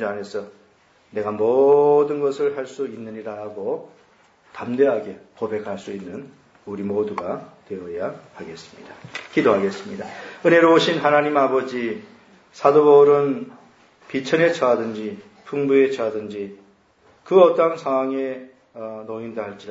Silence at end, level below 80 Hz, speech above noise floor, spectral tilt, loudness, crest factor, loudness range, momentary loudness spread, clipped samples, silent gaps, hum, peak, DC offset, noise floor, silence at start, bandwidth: 0 s; -70 dBFS; 36 dB; -6 dB/octave; -20 LUFS; 20 dB; 9 LU; 20 LU; under 0.1%; none; none; 0 dBFS; under 0.1%; -56 dBFS; 0 s; 7.8 kHz